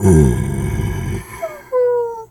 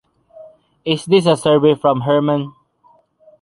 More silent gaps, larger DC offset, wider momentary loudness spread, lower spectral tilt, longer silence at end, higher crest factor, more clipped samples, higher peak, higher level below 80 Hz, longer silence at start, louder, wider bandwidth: neither; neither; first, 13 LU vs 10 LU; about the same, -7.5 dB/octave vs -6.5 dB/octave; second, 0.05 s vs 0.9 s; about the same, 16 dB vs 16 dB; neither; about the same, 0 dBFS vs -2 dBFS; first, -28 dBFS vs -58 dBFS; second, 0 s vs 0.4 s; second, -18 LUFS vs -15 LUFS; first, 18.5 kHz vs 11.5 kHz